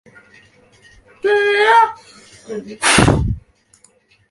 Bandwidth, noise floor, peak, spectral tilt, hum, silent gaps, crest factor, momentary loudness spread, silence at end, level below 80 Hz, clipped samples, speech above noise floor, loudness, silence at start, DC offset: 11.5 kHz; -54 dBFS; 0 dBFS; -4 dB/octave; none; none; 18 dB; 18 LU; 0.9 s; -34 dBFS; under 0.1%; 40 dB; -14 LUFS; 1.25 s; under 0.1%